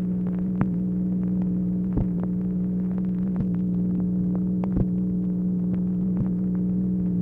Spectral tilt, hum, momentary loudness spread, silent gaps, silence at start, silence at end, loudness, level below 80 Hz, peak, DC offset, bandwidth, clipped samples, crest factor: -12.5 dB/octave; 60 Hz at -35 dBFS; 1 LU; none; 0 s; 0 s; -25 LUFS; -42 dBFS; -8 dBFS; under 0.1%; 2.5 kHz; under 0.1%; 16 dB